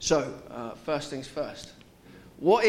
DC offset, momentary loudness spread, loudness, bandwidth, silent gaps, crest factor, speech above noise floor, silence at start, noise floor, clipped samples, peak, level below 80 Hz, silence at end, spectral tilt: under 0.1%; 24 LU; -31 LUFS; 15.5 kHz; none; 20 dB; 25 dB; 0 s; -52 dBFS; under 0.1%; -8 dBFS; -56 dBFS; 0 s; -4 dB/octave